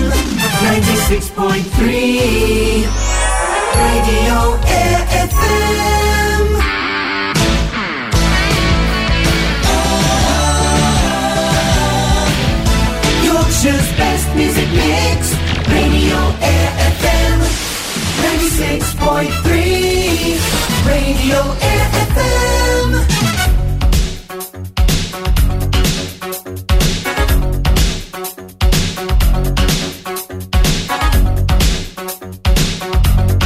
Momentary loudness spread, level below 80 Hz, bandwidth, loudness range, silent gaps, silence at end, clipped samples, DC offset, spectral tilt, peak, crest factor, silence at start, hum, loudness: 5 LU; -18 dBFS; 16 kHz; 3 LU; none; 0 s; under 0.1%; under 0.1%; -4.5 dB/octave; -2 dBFS; 12 dB; 0 s; none; -14 LUFS